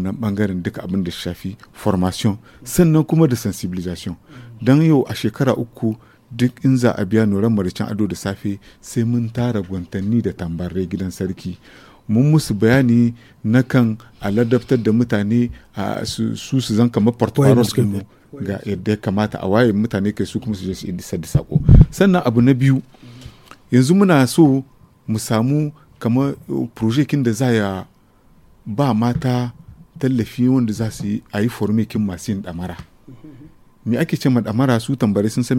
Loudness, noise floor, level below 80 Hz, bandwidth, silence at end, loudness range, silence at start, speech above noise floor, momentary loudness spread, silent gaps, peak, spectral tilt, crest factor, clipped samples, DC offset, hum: -18 LUFS; -51 dBFS; -34 dBFS; 16.5 kHz; 0 s; 5 LU; 0 s; 34 dB; 13 LU; none; 0 dBFS; -7 dB/octave; 18 dB; under 0.1%; under 0.1%; none